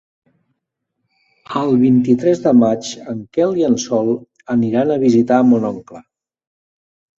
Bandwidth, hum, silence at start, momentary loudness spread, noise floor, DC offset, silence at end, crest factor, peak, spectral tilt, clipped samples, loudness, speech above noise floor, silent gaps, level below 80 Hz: 7.6 kHz; none; 1.5 s; 12 LU; -76 dBFS; under 0.1%; 1.2 s; 16 dB; -2 dBFS; -6.5 dB/octave; under 0.1%; -15 LUFS; 61 dB; none; -58 dBFS